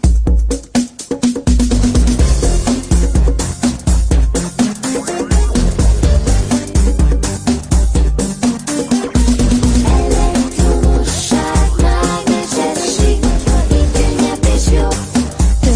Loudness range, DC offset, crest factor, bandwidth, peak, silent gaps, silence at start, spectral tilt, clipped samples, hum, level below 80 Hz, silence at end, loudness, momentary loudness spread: 1 LU; under 0.1%; 12 dB; 10.5 kHz; 0 dBFS; none; 0 s; -5.5 dB/octave; under 0.1%; none; -14 dBFS; 0 s; -14 LUFS; 4 LU